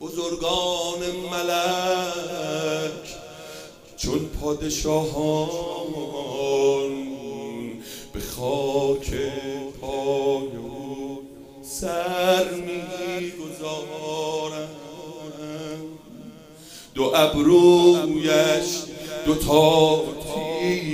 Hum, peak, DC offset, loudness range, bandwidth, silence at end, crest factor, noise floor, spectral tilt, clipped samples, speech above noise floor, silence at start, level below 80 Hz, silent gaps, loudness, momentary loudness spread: none; -2 dBFS; under 0.1%; 10 LU; 15.5 kHz; 0 s; 22 dB; -44 dBFS; -4.5 dB/octave; under 0.1%; 25 dB; 0 s; -44 dBFS; none; -23 LUFS; 20 LU